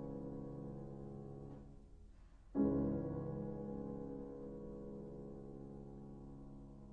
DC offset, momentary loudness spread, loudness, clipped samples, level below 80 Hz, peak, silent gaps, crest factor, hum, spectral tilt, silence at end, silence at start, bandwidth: under 0.1%; 18 LU; -46 LUFS; under 0.1%; -58 dBFS; -26 dBFS; none; 20 dB; none; -11 dB/octave; 0 s; 0 s; 3.1 kHz